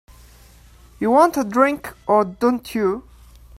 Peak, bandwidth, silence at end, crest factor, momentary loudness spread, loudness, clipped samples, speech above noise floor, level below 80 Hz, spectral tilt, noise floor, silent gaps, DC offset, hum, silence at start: 0 dBFS; 16 kHz; 0.6 s; 20 dB; 9 LU; -19 LUFS; under 0.1%; 29 dB; -48 dBFS; -5.5 dB/octave; -47 dBFS; none; under 0.1%; none; 1 s